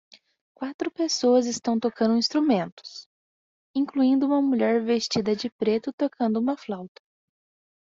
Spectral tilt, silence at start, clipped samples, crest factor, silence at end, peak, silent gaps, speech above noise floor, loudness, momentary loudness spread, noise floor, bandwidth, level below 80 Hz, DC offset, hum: -4.5 dB/octave; 0.6 s; under 0.1%; 16 dB; 1.05 s; -10 dBFS; 0.74-0.79 s, 2.72-2.77 s, 3.06-3.74 s, 5.52-5.59 s, 5.93-5.98 s; over 66 dB; -24 LUFS; 14 LU; under -90 dBFS; 7.8 kHz; -70 dBFS; under 0.1%; none